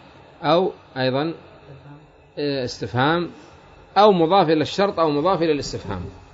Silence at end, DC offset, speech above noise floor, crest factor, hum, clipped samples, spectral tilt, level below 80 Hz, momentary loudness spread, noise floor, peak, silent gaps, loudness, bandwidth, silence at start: 0.15 s; under 0.1%; 26 dB; 20 dB; none; under 0.1%; -6 dB/octave; -52 dBFS; 14 LU; -46 dBFS; -2 dBFS; none; -20 LUFS; 7.8 kHz; 0.4 s